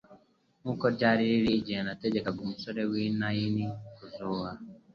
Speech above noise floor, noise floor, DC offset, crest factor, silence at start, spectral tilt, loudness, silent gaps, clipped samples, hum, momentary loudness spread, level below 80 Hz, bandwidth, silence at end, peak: 34 dB; -63 dBFS; under 0.1%; 20 dB; 0.1 s; -8 dB/octave; -30 LUFS; none; under 0.1%; none; 15 LU; -60 dBFS; 6.8 kHz; 0.15 s; -10 dBFS